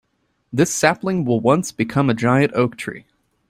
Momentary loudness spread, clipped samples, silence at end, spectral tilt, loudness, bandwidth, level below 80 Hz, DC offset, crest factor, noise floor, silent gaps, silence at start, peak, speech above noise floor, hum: 12 LU; under 0.1%; 0.5 s; -5.5 dB/octave; -18 LUFS; 16 kHz; -56 dBFS; under 0.1%; 18 dB; -59 dBFS; none; 0.55 s; -2 dBFS; 41 dB; none